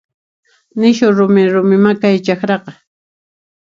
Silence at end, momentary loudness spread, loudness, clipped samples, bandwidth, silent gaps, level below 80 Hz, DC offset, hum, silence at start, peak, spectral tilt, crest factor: 1 s; 7 LU; -12 LUFS; under 0.1%; 7.4 kHz; none; -60 dBFS; under 0.1%; none; 0.75 s; 0 dBFS; -7 dB/octave; 14 dB